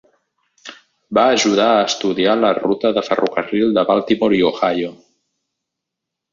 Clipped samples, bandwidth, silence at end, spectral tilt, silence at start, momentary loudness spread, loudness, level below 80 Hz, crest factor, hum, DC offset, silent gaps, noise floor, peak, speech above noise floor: under 0.1%; 7.6 kHz; 1.4 s; -4 dB/octave; 0.65 s; 9 LU; -16 LUFS; -58 dBFS; 16 dB; none; under 0.1%; none; -81 dBFS; -2 dBFS; 66 dB